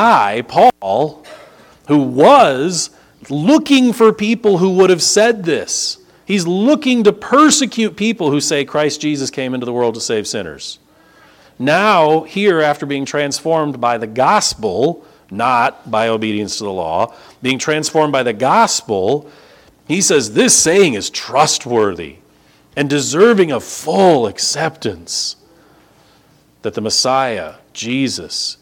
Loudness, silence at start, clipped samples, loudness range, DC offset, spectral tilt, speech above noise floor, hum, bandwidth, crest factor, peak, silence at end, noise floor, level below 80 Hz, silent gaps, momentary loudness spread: -14 LUFS; 0 s; under 0.1%; 5 LU; under 0.1%; -3.5 dB/octave; 37 dB; none; 18.5 kHz; 14 dB; 0 dBFS; 0.1 s; -51 dBFS; -54 dBFS; none; 11 LU